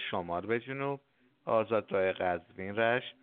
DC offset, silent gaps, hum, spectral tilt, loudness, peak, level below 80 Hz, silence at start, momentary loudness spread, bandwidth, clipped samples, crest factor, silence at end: under 0.1%; none; none; -3.5 dB/octave; -33 LUFS; -14 dBFS; -70 dBFS; 0 s; 8 LU; 4.3 kHz; under 0.1%; 20 dB; 0.1 s